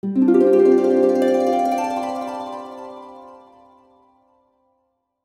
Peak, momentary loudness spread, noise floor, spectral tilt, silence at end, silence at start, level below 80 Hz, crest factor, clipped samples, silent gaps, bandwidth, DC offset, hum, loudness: -4 dBFS; 22 LU; -70 dBFS; -7 dB/octave; 1.9 s; 0.05 s; -66 dBFS; 16 dB; under 0.1%; none; 13 kHz; under 0.1%; none; -17 LUFS